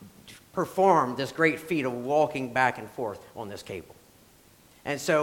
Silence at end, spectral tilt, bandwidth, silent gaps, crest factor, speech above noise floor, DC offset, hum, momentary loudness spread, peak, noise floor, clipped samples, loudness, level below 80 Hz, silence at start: 0 s; -5 dB/octave; 17.5 kHz; none; 20 dB; 30 dB; under 0.1%; none; 18 LU; -8 dBFS; -57 dBFS; under 0.1%; -27 LUFS; -64 dBFS; 0 s